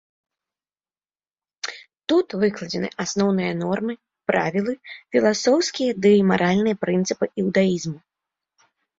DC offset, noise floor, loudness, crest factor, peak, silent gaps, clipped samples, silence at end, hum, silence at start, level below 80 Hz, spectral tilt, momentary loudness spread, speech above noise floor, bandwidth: under 0.1%; under -90 dBFS; -21 LUFS; 18 dB; -4 dBFS; none; under 0.1%; 1 s; none; 1.65 s; -62 dBFS; -5.5 dB/octave; 15 LU; over 69 dB; 7.8 kHz